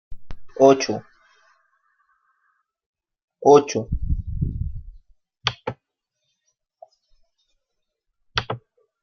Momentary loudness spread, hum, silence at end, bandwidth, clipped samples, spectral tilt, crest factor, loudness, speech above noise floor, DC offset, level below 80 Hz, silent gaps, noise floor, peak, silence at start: 19 LU; none; 0.45 s; 7 kHz; under 0.1%; -5.5 dB/octave; 22 dB; -21 LUFS; 63 dB; under 0.1%; -38 dBFS; 2.86-2.93 s, 3.23-3.28 s; -79 dBFS; -2 dBFS; 0.1 s